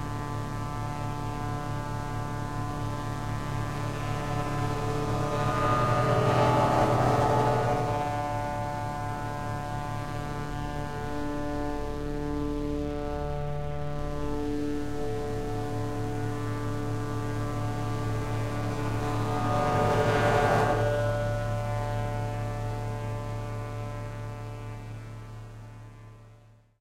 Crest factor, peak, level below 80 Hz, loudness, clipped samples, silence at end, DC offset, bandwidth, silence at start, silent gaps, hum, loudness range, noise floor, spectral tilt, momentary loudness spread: 20 dB; -10 dBFS; -42 dBFS; -30 LUFS; under 0.1%; 0 s; under 0.1%; 15.5 kHz; 0 s; none; none; 8 LU; -55 dBFS; -6.5 dB/octave; 11 LU